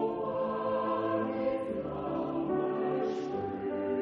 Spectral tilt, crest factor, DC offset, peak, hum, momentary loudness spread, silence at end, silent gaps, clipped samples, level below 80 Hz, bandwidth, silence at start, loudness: -6 dB/octave; 14 dB; under 0.1%; -18 dBFS; none; 4 LU; 0 s; none; under 0.1%; -62 dBFS; 7.2 kHz; 0 s; -33 LUFS